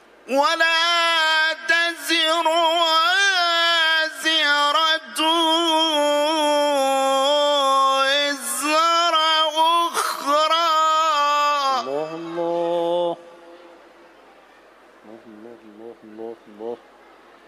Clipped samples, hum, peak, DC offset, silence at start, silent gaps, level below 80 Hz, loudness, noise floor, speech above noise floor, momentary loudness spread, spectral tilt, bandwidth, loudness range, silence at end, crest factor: under 0.1%; none; -4 dBFS; under 0.1%; 0.25 s; none; -78 dBFS; -18 LUFS; -50 dBFS; 32 dB; 10 LU; -0.5 dB/octave; 15.5 kHz; 9 LU; 0.7 s; 16 dB